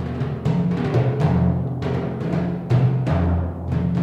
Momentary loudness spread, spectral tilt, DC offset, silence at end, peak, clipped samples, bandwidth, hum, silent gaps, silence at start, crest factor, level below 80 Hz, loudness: 6 LU; -9.5 dB/octave; under 0.1%; 0 s; -6 dBFS; under 0.1%; 6.8 kHz; none; none; 0 s; 14 dB; -40 dBFS; -21 LUFS